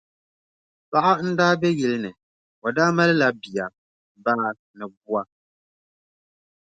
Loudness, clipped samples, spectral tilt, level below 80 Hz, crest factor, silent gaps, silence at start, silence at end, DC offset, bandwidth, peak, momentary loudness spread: -22 LUFS; under 0.1%; -6 dB/octave; -66 dBFS; 20 dB; 2.23-2.62 s, 3.78-4.15 s, 4.59-4.74 s, 4.97-5.01 s; 0.9 s; 1.45 s; under 0.1%; 9 kHz; -4 dBFS; 16 LU